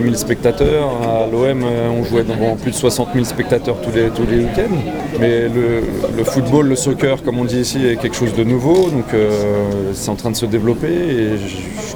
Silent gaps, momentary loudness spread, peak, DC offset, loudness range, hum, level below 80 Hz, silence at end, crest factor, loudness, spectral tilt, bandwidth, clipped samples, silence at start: none; 5 LU; -2 dBFS; under 0.1%; 1 LU; none; -34 dBFS; 0 s; 14 dB; -16 LUFS; -6 dB/octave; over 20 kHz; under 0.1%; 0 s